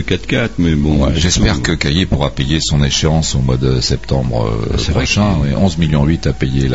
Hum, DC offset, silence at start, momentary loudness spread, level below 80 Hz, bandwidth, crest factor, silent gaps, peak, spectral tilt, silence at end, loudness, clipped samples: none; 3%; 0 s; 4 LU; -22 dBFS; 8 kHz; 14 dB; none; 0 dBFS; -5 dB/octave; 0 s; -14 LUFS; under 0.1%